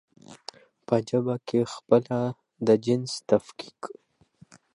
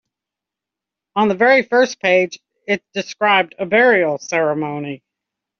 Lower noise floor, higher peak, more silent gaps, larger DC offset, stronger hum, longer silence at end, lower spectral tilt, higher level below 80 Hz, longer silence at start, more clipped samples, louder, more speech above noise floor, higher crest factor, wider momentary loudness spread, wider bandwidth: second, -57 dBFS vs -86 dBFS; second, -6 dBFS vs -2 dBFS; neither; neither; neither; first, 0.9 s vs 0.65 s; first, -6.5 dB/octave vs -2.5 dB/octave; about the same, -68 dBFS vs -64 dBFS; second, 0.3 s vs 1.15 s; neither; second, -26 LUFS vs -16 LUFS; second, 32 dB vs 69 dB; first, 22 dB vs 16 dB; first, 20 LU vs 14 LU; first, 11 kHz vs 7 kHz